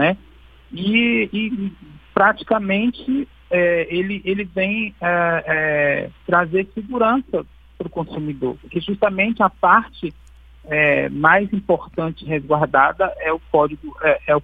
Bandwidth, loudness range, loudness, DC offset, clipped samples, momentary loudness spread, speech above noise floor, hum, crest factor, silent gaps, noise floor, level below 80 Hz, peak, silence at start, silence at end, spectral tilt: 4.9 kHz; 3 LU; -19 LUFS; under 0.1%; under 0.1%; 11 LU; 27 dB; none; 20 dB; none; -46 dBFS; -46 dBFS; 0 dBFS; 0 s; 0 s; -8.5 dB/octave